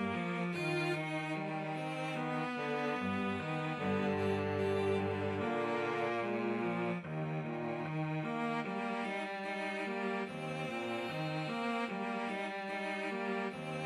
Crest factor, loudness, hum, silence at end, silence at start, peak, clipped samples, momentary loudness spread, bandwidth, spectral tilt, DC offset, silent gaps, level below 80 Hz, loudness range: 14 dB; -37 LUFS; none; 0 s; 0 s; -22 dBFS; under 0.1%; 4 LU; 13 kHz; -6.5 dB/octave; under 0.1%; none; -78 dBFS; 3 LU